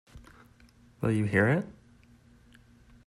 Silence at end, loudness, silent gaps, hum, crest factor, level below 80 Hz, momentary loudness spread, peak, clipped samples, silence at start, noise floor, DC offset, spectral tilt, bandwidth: 1.35 s; -28 LUFS; none; none; 20 dB; -58 dBFS; 10 LU; -12 dBFS; under 0.1%; 0.15 s; -59 dBFS; under 0.1%; -8 dB/octave; 12.5 kHz